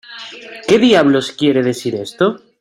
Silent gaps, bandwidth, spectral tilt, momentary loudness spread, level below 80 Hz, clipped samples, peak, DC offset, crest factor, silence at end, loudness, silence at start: none; 15.5 kHz; -5 dB/octave; 19 LU; -54 dBFS; under 0.1%; -2 dBFS; under 0.1%; 14 dB; 0.25 s; -14 LUFS; 0.1 s